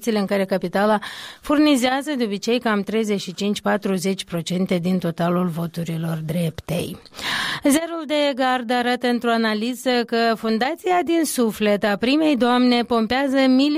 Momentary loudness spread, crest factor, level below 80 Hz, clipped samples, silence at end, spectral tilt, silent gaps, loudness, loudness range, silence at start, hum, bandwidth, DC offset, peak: 8 LU; 14 dB; -54 dBFS; under 0.1%; 0 s; -5 dB/octave; none; -21 LUFS; 4 LU; 0 s; none; 16 kHz; under 0.1%; -8 dBFS